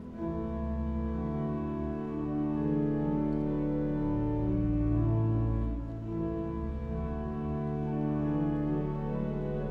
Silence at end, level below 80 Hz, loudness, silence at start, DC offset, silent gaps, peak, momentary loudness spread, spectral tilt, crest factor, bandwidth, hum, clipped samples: 0 s; -40 dBFS; -32 LUFS; 0 s; under 0.1%; none; -18 dBFS; 6 LU; -11.5 dB/octave; 14 dB; 4.6 kHz; none; under 0.1%